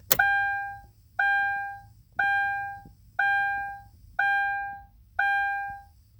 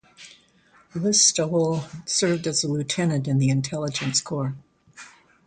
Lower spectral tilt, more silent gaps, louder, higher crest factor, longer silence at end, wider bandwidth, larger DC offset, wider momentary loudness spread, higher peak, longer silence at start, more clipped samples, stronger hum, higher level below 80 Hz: second, -1 dB/octave vs -4 dB/octave; neither; second, -26 LUFS vs -22 LUFS; first, 28 dB vs 20 dB; about the same, 0.35 s vs 0.4 s; first, over 20 kHz vs 9.6 kHz; neither; first, 17 LU vs 12 LU; first, 0 dBFS vs -4 dBFS; about the same, 0.1 s vs 0.2 s; neither; neither; first, -56 dBFS vs -62 dBFS